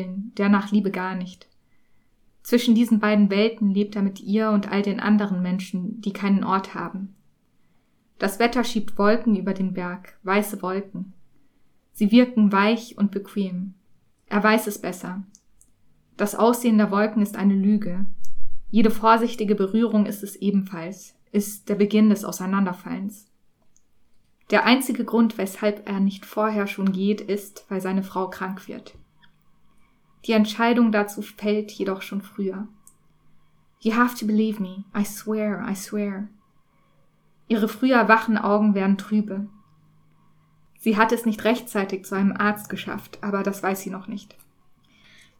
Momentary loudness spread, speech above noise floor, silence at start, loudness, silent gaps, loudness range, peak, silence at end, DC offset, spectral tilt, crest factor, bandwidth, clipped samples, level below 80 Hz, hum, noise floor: 14 LU; 40 dB; 0 s; -23 LUFS; none; 5 LU; -2 dBFS; 1.15 s; under 0.1%; -6 dB/octave; 20 dB; 19 kHz; under 0.1%; -54 dBFS; none; -62 dBFS